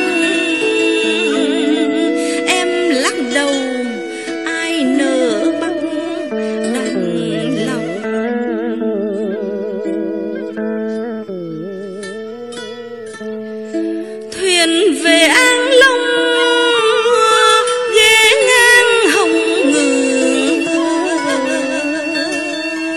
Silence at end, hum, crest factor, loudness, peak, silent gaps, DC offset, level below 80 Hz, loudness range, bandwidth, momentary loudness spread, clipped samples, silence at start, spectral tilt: 0 s; none; 14 dB; -14 LUFS; 0 dBFS; none; 0.2%; -58 dBFS; 13 LU; 15.5 kHz; 16 LU; under 0.1%; 0 s; -2.5 dB/octave